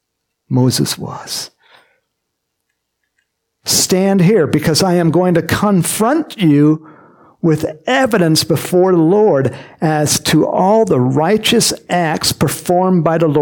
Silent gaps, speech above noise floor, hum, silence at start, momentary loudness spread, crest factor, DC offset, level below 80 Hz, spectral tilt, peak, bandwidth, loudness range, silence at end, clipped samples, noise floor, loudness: none; 60 dB; none; 0.5 s; 8 LU; 12 dB; under 0.1%; -50 dBFS; -5 dB/octave; -2 dBFS; 17.5 kHz; 7 LU; 0 s; under 0.1%; -73 dBFS; -13 LUFS